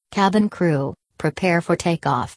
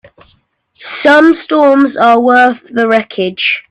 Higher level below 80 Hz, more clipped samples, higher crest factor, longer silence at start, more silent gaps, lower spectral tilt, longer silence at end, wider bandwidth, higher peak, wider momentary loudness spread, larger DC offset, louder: about the same, -52 dBFS vs -56 dBFS; neither; first, 16 dB vs 10 dB; second, 0.1 s vs 0.85 s; neither; about the same, -6.5 dB/octave vs -5.5 dB/octave; about the same, 0 s vs 0.1 s; first, 11 kHz vs 9.8 kHz; second, -4 dBFS vs 0 dBFS; about the same, 8 LU vs 7 LU; neither; second, -21 LUFS vs -9 LUFS